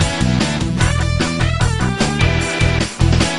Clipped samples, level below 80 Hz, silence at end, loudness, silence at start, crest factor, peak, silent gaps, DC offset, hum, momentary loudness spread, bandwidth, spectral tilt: under 0.1%; -24 dBFS; 0 s; -16 LUFS; 0 s; 16 dB; 0 dBFS; none; 0.8%; none; 2 LU; 11.5 kHz; -5 dB/octave